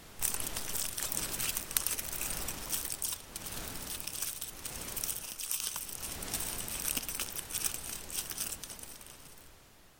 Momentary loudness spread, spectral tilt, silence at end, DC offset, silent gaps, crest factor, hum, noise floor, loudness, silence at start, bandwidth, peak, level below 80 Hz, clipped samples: 8 LU; -0.5 dB/octave; 0 s; under 0.1%; none; 32 dB; none; -58 dBFS; -35 LUFS; 0 s; 17 kHz; -6 dBFS; -54 dBFS; under 0.1%